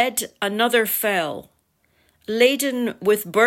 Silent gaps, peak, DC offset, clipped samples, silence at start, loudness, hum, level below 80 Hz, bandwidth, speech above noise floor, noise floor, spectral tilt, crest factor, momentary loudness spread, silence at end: none; -4 dBFS; under 0.1%; under 0.1%; 0 s; -21 LUFS; none; -68 dBFS; 16.5 kHz; 44 dB; -65 dBFS; -2.5 dB/octave; 18 dB; 11 LU; 0 s